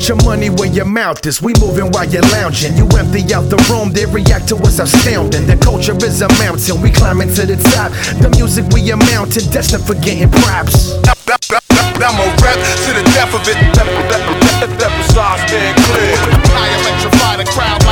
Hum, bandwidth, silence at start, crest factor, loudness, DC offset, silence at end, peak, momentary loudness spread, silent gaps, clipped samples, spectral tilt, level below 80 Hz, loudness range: none; 20 kHz; 0 s; 10 dB; -10 LUFS; under 0.1%; 0 s; 0 dBFS; 4 LU; none; under 0.1%; -4.5 dB/octave; -18 dBFS; 1 LU